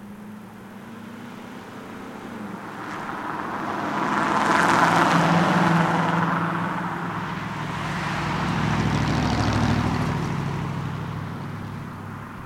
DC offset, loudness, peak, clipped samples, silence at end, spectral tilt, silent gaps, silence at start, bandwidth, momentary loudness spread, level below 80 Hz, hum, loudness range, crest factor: under 0.1%; -23 LUFS; -6 dBFS; under 0.1%; 0 s; -6 dB/octave; none; 0 s; 16 kHz; 20 LU; -44 dBFS; none; 12 LU; 18 dB